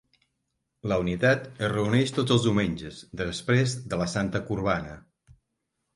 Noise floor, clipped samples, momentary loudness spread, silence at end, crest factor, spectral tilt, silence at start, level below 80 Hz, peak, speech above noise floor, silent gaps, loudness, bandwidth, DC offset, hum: -80 dBFS; under 0.1%; 10 LU; 0.95 s; 18 dB; -5.5 dB/octave; 0.85 s; -50 dBFS; -8 dBFS; 54 dB; none; -26 LUFS; 11.5 kHz; under 0.1%; none